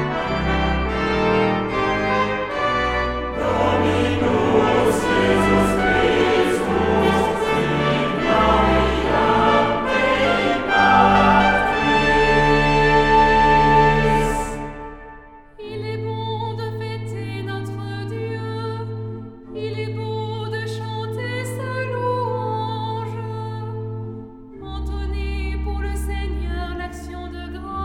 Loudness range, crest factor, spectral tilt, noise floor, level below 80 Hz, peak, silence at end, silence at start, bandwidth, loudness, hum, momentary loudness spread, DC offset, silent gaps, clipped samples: 12 LU; 18 dB; -6 dB/octave; -42 dBFS; -32 dBFS; -2 dBFS; 0 s; 0 s; 15.5 kHz; -19 LUFS; none; 16 LU; under 0.1%; none; under 0.1%